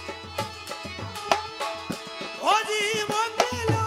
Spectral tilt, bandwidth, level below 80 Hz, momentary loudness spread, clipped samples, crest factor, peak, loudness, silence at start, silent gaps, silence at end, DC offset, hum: -3.5 dB/octave; 16.5 kHz; -56 dBFS; 11 LU; under 0.1%; 24 dB; -2 dBFS; -27 LUFS; 0 s; none; 0 s; under 0.1%; none